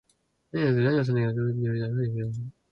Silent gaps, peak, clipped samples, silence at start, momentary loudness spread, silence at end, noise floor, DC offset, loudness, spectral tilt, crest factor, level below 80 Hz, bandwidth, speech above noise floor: none; -12 dBFS; under 0.1%; 0.55 s; 10 LU; 0.2 s; -70 dBFS; under 0.1%; -27 LUFS; -9.5 dB/octave; 14 dB; -60 dBFS; 5.8 kHz; 44 dB